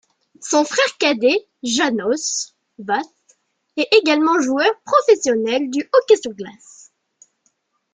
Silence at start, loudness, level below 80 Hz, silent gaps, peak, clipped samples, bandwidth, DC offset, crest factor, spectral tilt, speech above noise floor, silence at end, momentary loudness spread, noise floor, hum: 0.4 s; -17 LUFS; -68 dBFS; none; -2 dBFS; under 0.1%; 9.6 kHz; under 0.1%; 18 dB; -2 dB/octave; 49 dB; 1.4 s; 16 LU; -66 dBFS; none